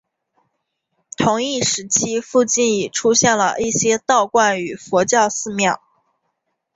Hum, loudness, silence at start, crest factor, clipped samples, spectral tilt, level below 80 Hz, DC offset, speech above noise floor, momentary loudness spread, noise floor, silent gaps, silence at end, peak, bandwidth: none; -17 LUFS; 1.2 s; 18 dB; under 0.1%; -2.5 dB/octave; -58 dBFS; under 0.1%; 56 dB; 6 LU; -74 dBFS; none; 1 s; -2 dBFS; 8 kHz